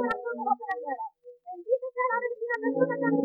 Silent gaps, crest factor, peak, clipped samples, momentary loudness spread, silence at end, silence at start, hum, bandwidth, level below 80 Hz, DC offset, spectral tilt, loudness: none; 18 dB; -12 dBFS; under 0.1%; 15 LU; 0 s; 0 s; none; 5.4 kHz; -74 dBFS; under 0.1%; -8.5 dB/octave; -29 LUFS